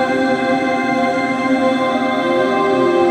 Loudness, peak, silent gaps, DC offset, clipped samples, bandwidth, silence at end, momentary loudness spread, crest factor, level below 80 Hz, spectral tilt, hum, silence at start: -16 LUFS; -2 dBFS; none; under 0.1%; under 0.1%; 10.5 kHz; 0 s; 2 LU; 12 dB; -60 dBFS; -5.5 dB/octave; none; 0 s